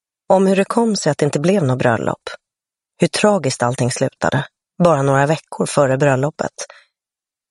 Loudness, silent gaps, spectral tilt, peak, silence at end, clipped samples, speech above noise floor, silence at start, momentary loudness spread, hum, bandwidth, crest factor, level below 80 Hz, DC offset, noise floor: -17 LUFS; none; -5.5 dB/octave; 0 dBFS; 0.85 s; under 0.1%; 73 dB; 0.3 s; 10 LU; none; 11.5 kHz; 16 dB; -54 dBFS; under 0.1%; -89 dBFS